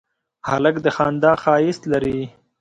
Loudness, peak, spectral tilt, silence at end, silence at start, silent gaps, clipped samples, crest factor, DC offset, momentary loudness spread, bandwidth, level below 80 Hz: -19 LUFS; -2 dBFS; -6.5 dB/octave; 0.3 s; 0.45 s; none; under 0.1%; 16 dB; under 0.1%; 11 LU; 9.2 kHz; -50 dBFS